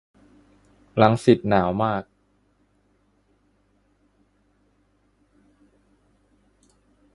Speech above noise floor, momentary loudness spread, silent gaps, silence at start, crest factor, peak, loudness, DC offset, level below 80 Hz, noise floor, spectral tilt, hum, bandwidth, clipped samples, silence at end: 46 dB; 11 LU; none; 0.95 s; 26 dB; 0 dBFS; -21 LUFS; under 0.1%; -54 dBFS; -65 dBFS; -7.5 dB/octave; 50 Hz at -60 dBFS; 11.5 kHz; under 0.1%; 5.1 s